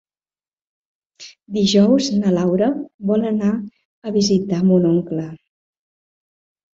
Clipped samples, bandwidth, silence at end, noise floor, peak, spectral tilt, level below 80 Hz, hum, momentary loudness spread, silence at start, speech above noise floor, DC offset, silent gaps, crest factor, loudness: under 0.1%; 7.8 kHz; 1.4 s; under -90 dBFS; -2 dBFS; -6.5 dB/octave; -58 dBFS; none; 12 LU; 1.2 s; over 73 dB; under 0.1%; 2.94-2.99 s, 3.85-4.02 s; 16 dB; -18 LUFS